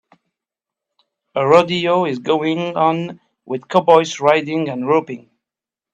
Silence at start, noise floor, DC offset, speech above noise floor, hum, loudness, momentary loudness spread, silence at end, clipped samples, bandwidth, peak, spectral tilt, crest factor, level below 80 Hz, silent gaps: 1.35 s; -88 dBFS; under 0.1%; 72 dB; none; -16 LUFS; 15 LU; 0.75 s; under 0.1%; 8.4 kHz; 0 dBFS; -5.5 dB/octave; 18 dB; -64 dBFS; none